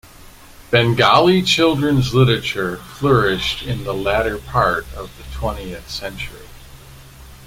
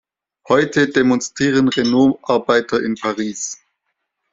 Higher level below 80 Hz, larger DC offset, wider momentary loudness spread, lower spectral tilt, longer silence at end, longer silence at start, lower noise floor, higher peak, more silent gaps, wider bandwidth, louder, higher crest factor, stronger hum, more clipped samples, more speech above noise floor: first, -36 dBFS vs -56 dBFS; neither; first, 16 LU vs 9 LU; about the same, -5.5 dB/octave vs -4.5 dB/octave; second, 0 s vs 0.8 s; second, 0.25 s vs 0.5 s; second, -42 dBFS vs -74 dBFS; about the same, -2 dBFS vs -2 dBFS; neither; first, 16.5 kHz vs 7.8 kHz; about the same, -17 LUFS vs -17 LUFS; about the same, 18 dB vs 16 dB; neither; neither; second, 24 dB vs 58 dB